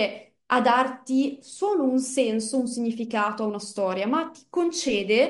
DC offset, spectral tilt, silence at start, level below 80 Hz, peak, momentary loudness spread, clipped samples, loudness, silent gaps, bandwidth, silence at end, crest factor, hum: under 0.1%; -3.5 dB/octave; 0 s; -68 dBFS; -6 dBFS; 8 LU; under 0.1%; -25 LUFS; none; 11.5 kHz; 0 s; 18 dB; none